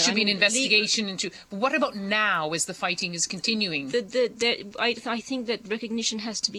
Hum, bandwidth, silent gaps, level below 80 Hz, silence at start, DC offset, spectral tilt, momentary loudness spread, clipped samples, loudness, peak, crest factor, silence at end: none; 13.5 kHz; none; -66 dBFS; 0 s; under 0.1%; -2 dB/octave; 10 LU; under 0.1%; -25 LUFS; -4 dBFS; 22 dB; 0 s